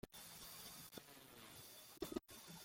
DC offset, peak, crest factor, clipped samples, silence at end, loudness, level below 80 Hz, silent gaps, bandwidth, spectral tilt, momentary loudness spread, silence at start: under 0.1%; -30 dBFS; 24 dB; under 0.1%; 0 s; -54 LUFS; -74 dBFS; none; 16.5 kHz; -3 dB/octave; 8 LU; 0.05 s